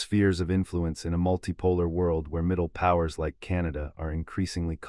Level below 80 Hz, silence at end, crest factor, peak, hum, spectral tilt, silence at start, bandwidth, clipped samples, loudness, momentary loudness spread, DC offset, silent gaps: -44 dBFS; 0 s; 18 dB; -10 dBFS; none; -7 dB/octave; 0 s; 11.5 kHz; under 0.1%; -28 LUFS; 8 LU; under 0.1%; none